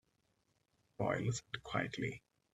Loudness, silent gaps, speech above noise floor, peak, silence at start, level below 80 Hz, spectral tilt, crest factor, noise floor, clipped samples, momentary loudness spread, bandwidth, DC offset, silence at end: -40 LUFS; none; 40 dB; -20 dBFS; 1 s; -68 dBFS; -5 dB/octave; 22 dB; -80 dBFS; under 0.1%; 6 LU; 11 kHz; under 0.1%; 0.35 s